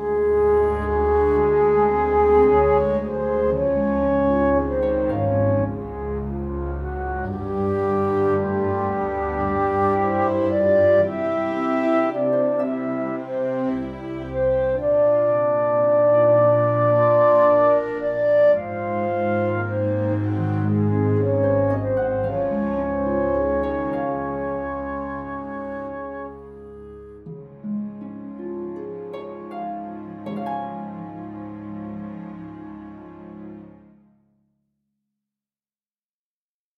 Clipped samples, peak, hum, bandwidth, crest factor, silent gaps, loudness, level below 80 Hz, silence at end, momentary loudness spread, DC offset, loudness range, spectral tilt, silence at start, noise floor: under 0.1%; -6 dBFS; none; 5 kHz; 16 dB; none; -21 LUFS; -40 dBFS; 3.1 s; 18 LU; under 0.1%; 16 LU; -10 dB/octave; 0 s; under -90 dBFS